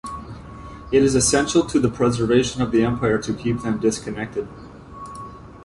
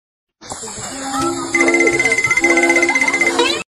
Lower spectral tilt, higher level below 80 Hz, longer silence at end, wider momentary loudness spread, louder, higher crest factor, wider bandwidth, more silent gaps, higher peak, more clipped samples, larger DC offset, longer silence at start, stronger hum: first, -5 dB/octave vs -2 dB/octave; first, -42 dBFS vs -50 dBFS; second, 0 s vs 0.15 s; first, 21 LU vs 14 LU; second, -20 LUFS vs -13 LUFS; about the same, 16 dB vs 16 dB; second, 11.5 kHz vs 13.5 kHz; neither; second, -6 dBFS vs 0 dBFS; neither; neither; second, 0.05 s vs 0.4 s; neither